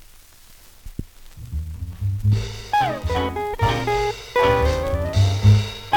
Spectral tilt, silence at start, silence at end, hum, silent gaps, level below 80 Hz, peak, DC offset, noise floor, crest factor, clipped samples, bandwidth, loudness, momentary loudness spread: -6 dB/octave; 0.85 s; 0 s; none; none; -32 dBFS; -4 dBFS; 0.2%; -47 dBFS; 18 dB; under 0.1%; 18 kHz; -21 LUFS; 17 LU